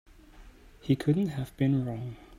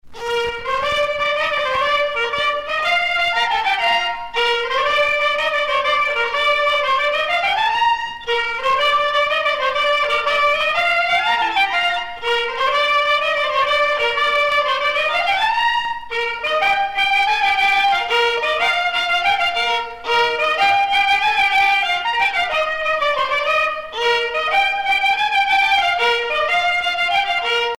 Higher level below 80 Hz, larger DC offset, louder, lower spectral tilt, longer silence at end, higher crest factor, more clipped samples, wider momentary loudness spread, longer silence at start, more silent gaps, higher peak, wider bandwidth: about the same, -54 dBFS vs -50 dBFS; neither; second, -29 LUFS vs -17 LUFS; first, -8.5 dB/octave vs -0.5 dB/octave; about the same, 0 s vs 0.05 s; first, 18 dB vs 12 dB; neither; first, 11 LU vs 5 LU; first, 0.35 s vs 0.05 s; neither; second, -12 dBFS vs -4 dBFS; second, 14.5 kHz vs 16.5 kHz